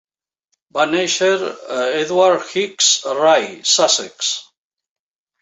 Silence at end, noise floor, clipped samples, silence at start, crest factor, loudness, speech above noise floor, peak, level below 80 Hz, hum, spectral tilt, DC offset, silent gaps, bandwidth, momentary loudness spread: 1 s; -71 dBFS; under 0.1%; 0.75 s; 16 dB; -16 LUFS; 55 dB; -2 dBFS; -68 dBFS; none; -1 dB/octave; under 0.1%; none; 8.4 kHz; 8 LU